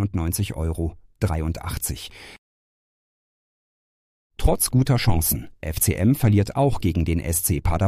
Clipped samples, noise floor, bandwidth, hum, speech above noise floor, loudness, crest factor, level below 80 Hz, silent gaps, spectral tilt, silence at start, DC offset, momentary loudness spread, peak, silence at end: under 0.1%; under -90 dBFS; 15.5 kHz; none; over 69 dB; -22 LUFS; 18 dB; -32 dBFS; 2.38-4.30 s; -5.5 dB/octave; 0 s; under 0.1%; 10 LU; -6 dBFS; 0 s